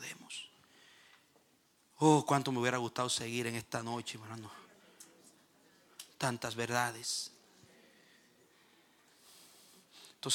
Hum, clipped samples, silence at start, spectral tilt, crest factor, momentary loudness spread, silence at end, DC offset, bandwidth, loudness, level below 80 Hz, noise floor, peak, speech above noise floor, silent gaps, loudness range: none; under 0.1%; 0 s; -4 dB/octave; 24 dB; 27 LU; 0 s; under 0.1%; 18 kHz; -35 LUFS; -80 dBFS; -71 dBFS; -14 dBFS; 36 dB; none; 9 LU